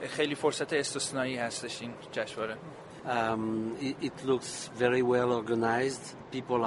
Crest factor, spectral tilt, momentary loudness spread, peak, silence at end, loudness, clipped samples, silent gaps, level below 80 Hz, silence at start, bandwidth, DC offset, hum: 20 dB; -4 dB/octave; 12 LU; -12 dBFS; 0 s; -31 LUFS; under 0.1%; none; -68 dBFS; 0 s; 11.5 kHz; under 0.1%; none